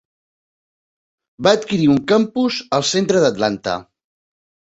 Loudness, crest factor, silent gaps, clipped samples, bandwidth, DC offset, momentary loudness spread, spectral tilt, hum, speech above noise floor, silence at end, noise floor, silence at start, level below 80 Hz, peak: -17 LUFS; 18 dB; none; under 0.1%; 8.2 kHz; under 0.1%; 7 LU; -4.5 dB/octave; none; over 74 dB; 0.95 s; under -90 dBFS; 1.4 s; -56 dBFS; 0 dBFS